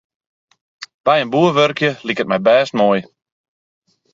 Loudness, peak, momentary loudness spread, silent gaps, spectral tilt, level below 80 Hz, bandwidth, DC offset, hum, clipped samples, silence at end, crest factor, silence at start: -15 LUFS; 0 dBFS; 8 LU; 0.94-1.04 s; -5.5 dB/octave; -62 dBFS; 7.6 kHz; under 0.1%; none; under 0.1%; 1.1 s; 18 dB; 0.8 s